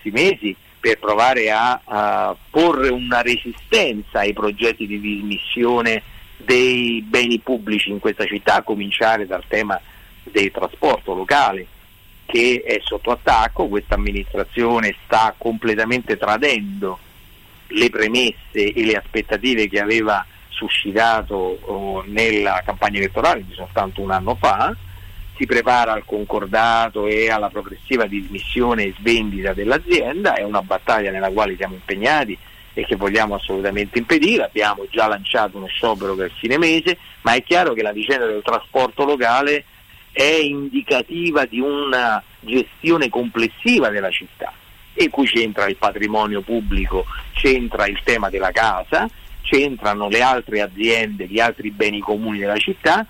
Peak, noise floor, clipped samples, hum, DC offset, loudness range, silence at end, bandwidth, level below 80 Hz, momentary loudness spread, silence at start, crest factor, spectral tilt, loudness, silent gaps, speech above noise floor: -4 dBFS; -46 dBFS; under 0.1%; none; under 0.1%; 2 LU; 0.05 s; 16.5 kHz; -36 dBFS; 8 LU; 0.05 s; 14 dB; -4 dB/octave; -18 LUFS; none; 27 dB